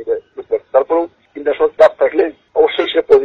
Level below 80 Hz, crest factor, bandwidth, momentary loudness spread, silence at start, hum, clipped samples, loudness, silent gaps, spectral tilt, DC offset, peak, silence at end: -52 dBFS; 14 dB; 6.8 kHz; 11 LU; 0 s; none; under 0.1%; -15 LUFS; none; -5 dB/octave; under 0.1%; 0 dBFS; 0 s